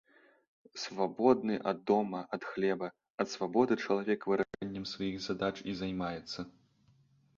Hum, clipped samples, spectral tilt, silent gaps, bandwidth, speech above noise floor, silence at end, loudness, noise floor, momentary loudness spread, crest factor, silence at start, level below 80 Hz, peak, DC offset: none; under 0.1%; -5.5 dB/octave; 3.10-3.18 s; 7.4 kHz; 35 dB; 0.85 s; -34 LUFS; -68 dBFS; 11 LU; 22 dB; 0.75 s; -68 dBFS; -14 dBFS; under 0.1%